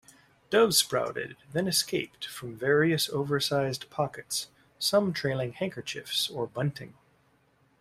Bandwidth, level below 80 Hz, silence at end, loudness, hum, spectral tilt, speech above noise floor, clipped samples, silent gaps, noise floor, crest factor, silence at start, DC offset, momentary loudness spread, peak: 16 kHz; -66 dBFS; 0.95 s; -28 LUFS; none; -3.5 dB/octave; 38 dB; under 0.1%; none; -67 dBFS; 22 dB; 0.5 s; under 0.1%; 13 LU; -6 dBFS